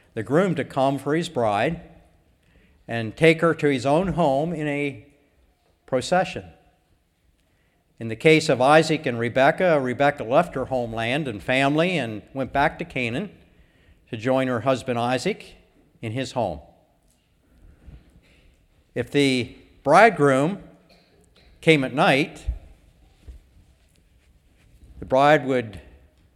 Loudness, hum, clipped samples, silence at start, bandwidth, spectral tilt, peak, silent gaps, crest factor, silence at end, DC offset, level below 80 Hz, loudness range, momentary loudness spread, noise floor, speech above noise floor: -21 LUFS; none; under 0.1%; 0.15 s; 14 kHz; -5.5 dB/octave; -2 dBFS; none; 22 dB; 0.55 s; under 0.1%; -48 dBFS; 9 LU; 15 LU; -64 dBFS; 43 dB